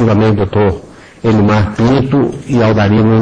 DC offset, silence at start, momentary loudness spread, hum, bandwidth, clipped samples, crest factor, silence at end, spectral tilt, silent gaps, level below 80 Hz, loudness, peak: under 0.1%; 0 s; 5 LU; none; 8.2 kHz; under 0.1%; 10 dB; 0 s; -8.5 dB/octave; none; -34 dBFS; -12 LUFS; 0 dBFS